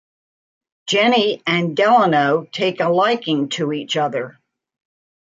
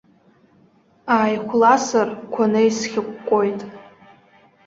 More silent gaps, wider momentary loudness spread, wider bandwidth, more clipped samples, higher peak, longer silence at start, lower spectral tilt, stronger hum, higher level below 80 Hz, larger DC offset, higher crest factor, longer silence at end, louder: neither; second, 9 LU vs 12 LU; first, 8.6 kHz vs 7.8 kHz; neither; about the same, -4 dBFS vs -2 dBFS; second, 0.85 s vs 1.05 s; about the same, -5 dB/octave vs -4.5 dB/octave; neither; about the same, -70 dBFS vs -66 dBFS; neither; about the same, 16 dB vs 18 dB; first, 1 s vs 0.85 s; about the same, -17 LUFS vs -19 LUFS